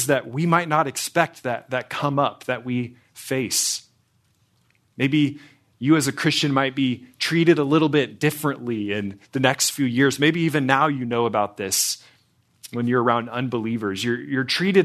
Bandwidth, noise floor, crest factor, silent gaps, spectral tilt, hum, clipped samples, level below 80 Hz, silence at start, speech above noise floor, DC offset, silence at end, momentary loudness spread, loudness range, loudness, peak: 14 kHz; -64 dBFS; 22 dB; none; -4 dB/octave; none; under 0.1%; -66 dBFS; 0 s; 43 dB; under 0.1%; 0 s; 9 LU; 5 LU; -22 LUFS; -2 dBFS